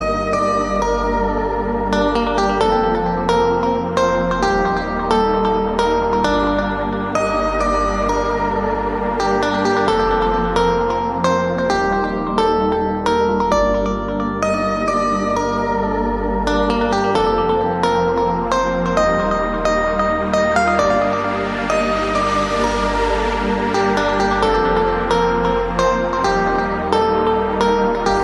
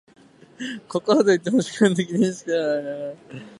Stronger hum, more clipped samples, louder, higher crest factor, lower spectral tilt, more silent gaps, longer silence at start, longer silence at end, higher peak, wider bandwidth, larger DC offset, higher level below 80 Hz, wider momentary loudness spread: neither; neither; first, -17 LUFS vs -21 LUFS; about the same, 16 dB vs 20 dB; about the same, -5.5 dB/octave vs -5.5 dB/octave; neither; second, 0 s vs 0.6 s; about the same, 0 s vs 0.05 s; about the same, -2 dBFS vs -4 dBFS; about the same, 11.5 kHz vs 11.5 kHz; neither; first, -30 dBFS vs -68 dBFS; second, 3 LU vs 15 LU